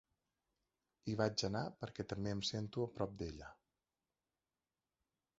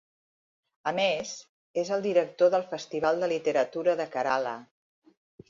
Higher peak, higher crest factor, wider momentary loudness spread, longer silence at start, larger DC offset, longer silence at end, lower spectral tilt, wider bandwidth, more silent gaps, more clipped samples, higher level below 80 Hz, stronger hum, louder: second, -20 dBFS vs -12 dBFS; first, 24 dB vs 18 dB; about the same, 12 LU vs 11 LU; first, 1.05 s vs 0.85 s; neither; first, 1.85 s vs 0.85 s; about the same, -5 dB/octave vs -4 dB/octave; about the same, 7.6 kHz vs 7.6 kHz; second, none vs 1.49-1.74 s; neither; first, -64 dBFS vs -72 dBFS; neither; second, -42 LUFS vs -28 LUFS